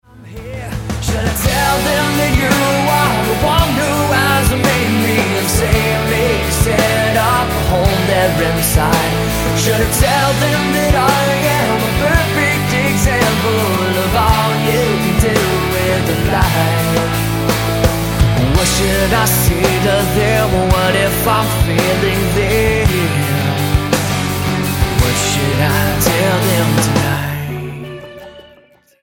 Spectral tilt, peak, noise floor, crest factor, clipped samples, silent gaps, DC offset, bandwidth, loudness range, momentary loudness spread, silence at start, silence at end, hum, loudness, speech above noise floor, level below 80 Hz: -4.5 dB/octave; 0 dBFS; -48 dBFS; 14 dB; under 0.1%; none; under 0.1%; 17 kHz; 2 LU; 3 LU; 0.15 s; 0.6 s; none; -14 LUFS; 35 dB; -24 dBFS